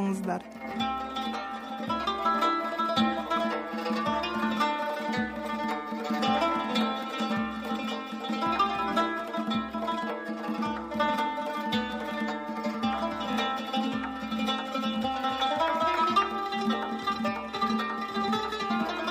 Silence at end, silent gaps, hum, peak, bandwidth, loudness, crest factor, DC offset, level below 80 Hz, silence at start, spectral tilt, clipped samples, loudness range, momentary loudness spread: 0 s; none; none; -14 dBFS; 15.5 kHz; -29 LUFS; 16 dB; under 0.1%; -58 dBFS; 0 s; -5 dB/octave; under 0.1%; 3 LU; 7 LU